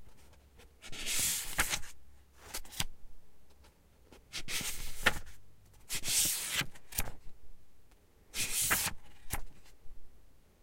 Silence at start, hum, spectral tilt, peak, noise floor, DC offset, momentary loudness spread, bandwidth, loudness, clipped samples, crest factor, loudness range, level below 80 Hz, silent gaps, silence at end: 0 s; none; -0.5 dB/octave; -10 dBFS; -61 dBFS; under 0.1%; 16 LU; 16.5 kHz; -34 LUFS; under 0.1%; 26 dB; 5 LU; -48 dBFS; none; 0.2 s